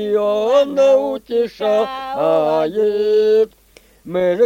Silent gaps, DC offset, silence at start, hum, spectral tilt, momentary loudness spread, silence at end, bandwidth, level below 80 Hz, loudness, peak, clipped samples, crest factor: none; under 0.1%; 0 s; none; -5.5 dB/octave; 7 LU; 0 s; 16 kHz; -56 dBFS; -16 LUFS; -2 dBFS; under 0.1%; 14 dB